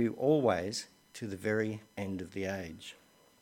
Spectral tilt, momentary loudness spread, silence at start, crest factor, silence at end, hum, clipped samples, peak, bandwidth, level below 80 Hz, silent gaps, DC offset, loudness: -5.5 dB/octave; 17 LU; 0 s; 20 dB; 0.5 s; none; under 0.1%; -14 dBFS; 16.5 kHz; -68 dBFS; none; under 0.1%; -34 LUFS